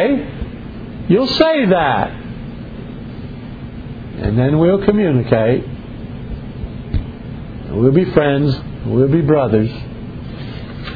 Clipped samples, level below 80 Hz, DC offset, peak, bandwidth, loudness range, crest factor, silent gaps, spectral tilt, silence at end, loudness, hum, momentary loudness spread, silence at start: under 0.1%; -32 dBFS; under 0.1%; 0 dBFS; 5 kHz; 3 LU; 16 dB; none; -9 dB/octave; 0 s; -15 LUFS; none; 17 LU; 0 s